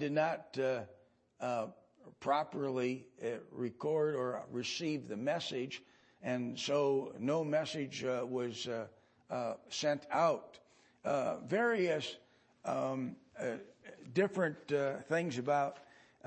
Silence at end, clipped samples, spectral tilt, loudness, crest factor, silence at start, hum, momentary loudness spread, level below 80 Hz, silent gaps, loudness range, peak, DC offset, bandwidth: 0.4 s; under 0.1%; -5 dB/octave; -37 LUFS; 20 dB; 0 s; none; 11 LU; -82 dBFS; none; 2 LU; -18 dBFS; under 0.1%; 8.4 kHz